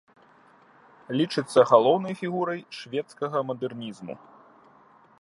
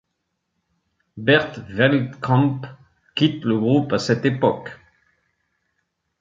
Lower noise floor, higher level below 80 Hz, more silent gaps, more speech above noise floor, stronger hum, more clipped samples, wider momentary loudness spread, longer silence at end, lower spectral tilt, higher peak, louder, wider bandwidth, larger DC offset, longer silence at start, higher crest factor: second, -57 dBFS vs -76 dBFS; second, -76 dBFS vs -58 dBFS; neither; second, 32 dB vs 57 dB; neither; neither; first, 19 LU vs 13 LU; second, 1.05 s vs 1.45 s; about the same, -6 dB/octave vs -6.5 dB/octave; about the same, -4 dBFS vs -2 dBFS; second, -25 LUFS vs -20 LUFS; first, 11.5 kHz vs 7.6 kHz; neither; about the same, 1.1 s vs 1.15 s; about the same, 24 dB vs 20 dB